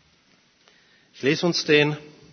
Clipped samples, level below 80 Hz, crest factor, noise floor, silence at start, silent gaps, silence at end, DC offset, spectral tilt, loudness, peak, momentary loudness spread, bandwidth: under 0.1%; -70 dBFS; 20 dB; -61 dBFS; 1.2 s; none; 0.25 s; under 0.1%; -4.5 dB/octave; -21 LUFS; -4 dBFS; 8 LU; 6.6 kHz